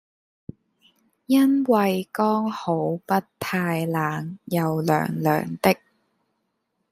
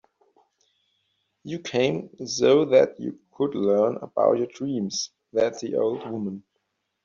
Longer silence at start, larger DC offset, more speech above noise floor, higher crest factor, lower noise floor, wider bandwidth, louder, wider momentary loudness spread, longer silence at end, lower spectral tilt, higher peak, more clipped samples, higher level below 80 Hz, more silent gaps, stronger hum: second, 1.3 s vs 1.45 s; neither; about the same, 53 dB vs 53 dB; about the same, 20 dB vs 20 dB; about the same, -75 dBFS vs -77 dBFS; first, 16 kHz vs 7.6 kHz; about the same, -23 LUFS vs -24 LUFS; second, 7 LU vs 15 LU; first, 1.15 s vs 0.65 s; first, -6.5 dB/octave vs -4.5 dB/octave; about the same, -4 dBFS vs -6 dBFS; neither; about the same, -64 dBFS vs -68 dBFS; neither; neither